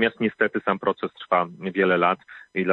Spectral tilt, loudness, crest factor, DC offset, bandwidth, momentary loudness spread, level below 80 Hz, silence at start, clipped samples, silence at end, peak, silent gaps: -8.5 dB/octave; -24 LUFS; 18 dB; under 0.1%; 4.8 kHz; 10 LU; -66 dBFS; 0 s; under 0.1%; 0 s; -6 dBFS; none